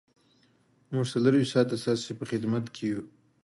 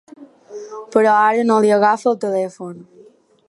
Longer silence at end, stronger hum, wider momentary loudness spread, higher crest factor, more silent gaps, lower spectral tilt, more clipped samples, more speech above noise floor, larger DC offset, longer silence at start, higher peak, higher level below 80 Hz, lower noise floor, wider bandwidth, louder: second, 0.35 s vs 0.65 s; neither; second, 9 LU vs 20 LU; about the same, 20 dB vs 16 dB; neither; about the same, -6.5 dB/octave vs -5.5 dB/octave; neither; first, 38 dB vs 33 dB; neither; first, 0.9 s vs 0.2 s; second, -10 dBFS vs 0 dBFS; about the same, -70 dBFS vs -70 dBFS; first, -65 dBFS vs -49 dBFS; about the same, 11.5 kHz vs 11.5 kHz; second, -28 LUFS vs -16 LUFS